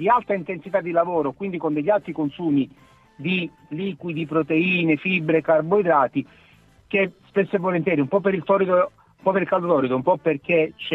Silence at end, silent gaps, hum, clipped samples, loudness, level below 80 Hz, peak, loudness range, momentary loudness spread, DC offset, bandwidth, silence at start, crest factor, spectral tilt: 0 s; none; none; under 0.1%; -22 LUFS; -62 dBFS; -4 dBFS; 3 LU; 9 LU; under 0.1%; 5.8 kHz; 0 s; 16 dB; -9 dB/octave